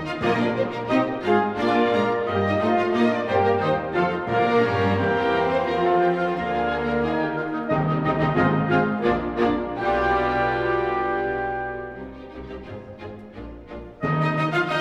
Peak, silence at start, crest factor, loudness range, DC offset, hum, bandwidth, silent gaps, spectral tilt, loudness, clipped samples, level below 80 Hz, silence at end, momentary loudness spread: -8 dBFS; 0 s; 16 dB; 7 LU; under 0.1%; none; 9.4 kHz; none; -7.5 dB/octave; -22 LUFS; under 0.1%; -46 dBFS; 0 s; 17 LU